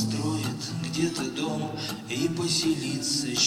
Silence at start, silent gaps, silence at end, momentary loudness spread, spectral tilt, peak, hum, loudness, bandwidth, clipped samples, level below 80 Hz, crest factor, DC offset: 0 s; none; 0 s; 7 LU; -3.5 dB/octave; -10 dBFS; none; -28 LUFS; 16.5 kHz; under 0.1%; -60 dBFS; 18 dB; under 0.1%